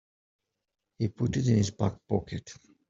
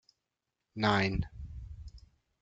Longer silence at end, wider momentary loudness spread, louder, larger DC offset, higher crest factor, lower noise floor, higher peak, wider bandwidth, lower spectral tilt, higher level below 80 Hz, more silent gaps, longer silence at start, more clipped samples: about the same, 0.35 s vs 0.45 s; second, 15 LU vs 22 LU; about the same, -29 LUFS vs -31 LUFS; neither; about the same, 20 dB vs 24 dB; about the same, -85 dBFS vs -87 dBFS; about the same, -12 dBFS vs -12 dBFS; about the same, 7.8 kHz vs 7.8 kHz; about the same, -7 dB/octave vs -6 dB/octave; second, -56 dBFS vs -48 dBFS; neither; first, 1 s vs 0.75 s; neither